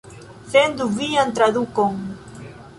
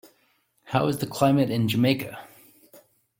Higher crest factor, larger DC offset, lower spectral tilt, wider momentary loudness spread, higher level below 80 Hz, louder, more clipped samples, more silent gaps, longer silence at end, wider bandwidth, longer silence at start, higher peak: about the same, 18 dB vs 20 dB; neither; second, -4.5 dB/octave vs -6.5 dB/octave; first, 21 LU vs 10 LU; first, -54 dBFS vs -62 dBFS; first, -19 LUFS vs -24 LUFS; neither; neither; second, 0.1 s vs 0.4 s; second, 11.5 kHz vs 17 kHz; second, 0.05 s vs 0.65 s; first, -2 dBFS vs -6 dBFS